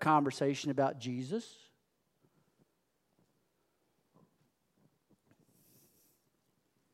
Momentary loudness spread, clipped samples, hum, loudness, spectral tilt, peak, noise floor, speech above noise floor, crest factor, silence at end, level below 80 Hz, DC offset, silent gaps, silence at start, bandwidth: 11 LU; under 0.1%; none; -34 LUFS; -6 dB/octave; -14 dBFS; -79 dBFS; 46 dB; 24 dB; 5.4 s; -90 dBFS; under 0.1%; none; 0 s; 14.5 kHz